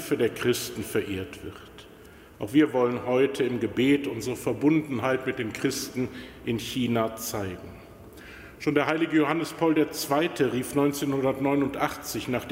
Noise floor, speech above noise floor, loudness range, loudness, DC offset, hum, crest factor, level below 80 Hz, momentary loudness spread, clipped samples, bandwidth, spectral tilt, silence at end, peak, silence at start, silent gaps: -49 dBFS; 23 dB; 5 LU; -26 LUFS; under 0.1%; none; 18 dB; -56 dBFS; 16 LU; under 0.1%; 16 kHz; -5 dB/octave; 0 s; -8 dBFS; 0 s; none